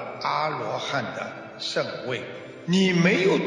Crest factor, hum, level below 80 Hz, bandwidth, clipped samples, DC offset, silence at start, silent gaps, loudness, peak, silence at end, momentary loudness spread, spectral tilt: 18 dB; none; -72 dBFS; 10 kHz; under 0.1%; under 0.1%; 0 s; none; -25 LUFS; -8 dBFS; 0 s; 14 LU; -5.5 dB/octave